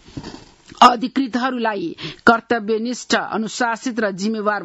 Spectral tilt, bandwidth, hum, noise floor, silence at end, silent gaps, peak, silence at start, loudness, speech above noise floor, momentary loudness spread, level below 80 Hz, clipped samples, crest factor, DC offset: -4 dB/octave; 12 kHz; none; -41 dBFS; 0 s; none; 0 dBFS; 0.1 s; -19 LUFS; 22 dB; 13 LU; -54 dBFS; under 0.1%; 20 dB; under 0.1%